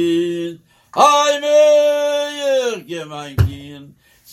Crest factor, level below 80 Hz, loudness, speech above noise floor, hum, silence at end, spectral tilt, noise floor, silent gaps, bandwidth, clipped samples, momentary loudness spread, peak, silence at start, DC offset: 16 dB; -42 dBFS; -16 LUFS; 30 dB; none; 0.5 s; -5 dB/octave; -45 dBFS; none; 15 kHz; under 0.1%; 16 LU; 0 dBFS; 0 s; under 0.1%